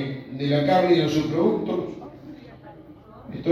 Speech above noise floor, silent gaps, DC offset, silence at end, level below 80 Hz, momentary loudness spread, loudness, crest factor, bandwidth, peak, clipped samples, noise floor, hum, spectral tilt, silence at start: 25 dB; none; under 0.1%; 0 s; -56 dBFS; 24 LU; -22 LUFS; 18 dB; 13 kHz; -6 dBFS; under 0.1%; -45 dBFS; none; -7 dB/octave; 0 s